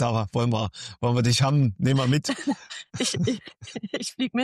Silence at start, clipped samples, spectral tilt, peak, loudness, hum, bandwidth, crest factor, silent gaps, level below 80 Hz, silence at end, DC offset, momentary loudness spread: 0 s; under 0.1%; -5.5 dB/octave; -12 dBFS; -25 LUFS; none; 13 kHz; 14 dB; none; -56 dBFS; 0 s; under 0.1%; 12 LU